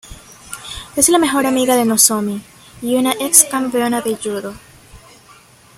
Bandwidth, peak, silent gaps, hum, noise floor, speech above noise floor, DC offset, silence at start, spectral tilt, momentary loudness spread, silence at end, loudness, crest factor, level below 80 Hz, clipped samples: 16.5 kHz; 0 dBFS; none; none; -46 dBFS; 30 dB; under 0.1%; 0.05 s; -2 dB/octave; 19 LU; 0.8 s; -14 LUFS; 18 dB; -48 dBFS; under 0.1%